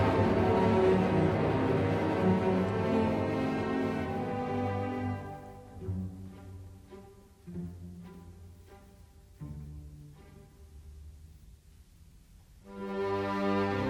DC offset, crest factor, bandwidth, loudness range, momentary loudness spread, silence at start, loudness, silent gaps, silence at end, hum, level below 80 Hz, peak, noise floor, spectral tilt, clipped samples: under 0.1%; 18 dB; 13 kHz; 22 LU; 24 LU; 0 s; -30 LUFS; none; 0 s; none; -52 dBFS; -14 dBFS; -57 dBFS; -8 dB/octave; under 0.1%